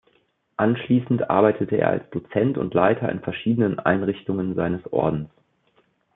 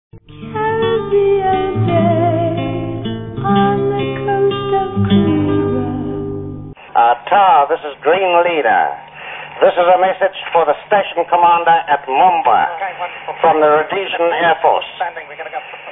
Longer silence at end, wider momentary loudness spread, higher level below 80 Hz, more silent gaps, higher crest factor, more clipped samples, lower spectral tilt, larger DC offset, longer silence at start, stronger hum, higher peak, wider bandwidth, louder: first, 0.9 s vs 0 s; second, 7 LU vs 13 LU; second, -56 dBFS vs -44 dBFS; neither; first, 20 dB vs 14 dB; neither; about the same, -11.5 dB/octave vs -10.5 dB/octave; neither; first, 0.6 s vs 0.15 s; neither; second, -4 dBFS vs 0 dBFS; about the same, 4 kHz vs 3.9 kHz; second, -22 LUFS vs -14 LUFS